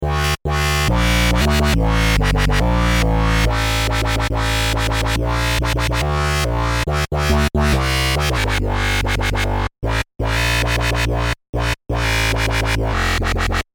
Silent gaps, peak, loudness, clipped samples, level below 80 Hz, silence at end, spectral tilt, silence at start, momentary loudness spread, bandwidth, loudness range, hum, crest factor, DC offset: 11.49-11.53 s; -4 dBFS; -18 LUFS; under 0.1%; -22 dBFS; 0.1 s; -4.5 dB/octave; 0 s; 4 LU; 20 kHz; 3 LU; none; 14 dB; under 0.1%